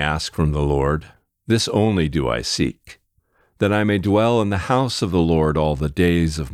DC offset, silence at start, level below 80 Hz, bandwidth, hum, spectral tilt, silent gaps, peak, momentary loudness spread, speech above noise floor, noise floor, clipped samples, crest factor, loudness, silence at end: under 0.1%; 0 s; -34 dBFS; 14.5 kHz; none; -6 dB/octave; none; -4 dBFS; 5 LU; 44 dB; -63 dBFS; under 0.1%; 16 dB; -20 LUFS; 0 s